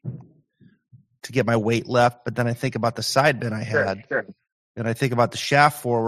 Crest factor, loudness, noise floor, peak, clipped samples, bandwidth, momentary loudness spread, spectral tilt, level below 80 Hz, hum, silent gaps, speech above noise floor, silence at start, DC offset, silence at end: 22 dB; -22 LUFS; -57 dBFS; -2 dBFS; under 0.1%; 15 kHz; 13 LU; -5 dB/octave; -60 dBFS; none; 4.52-4.75 s; 35 dB; 0.05 s; under 0.1%; 0 s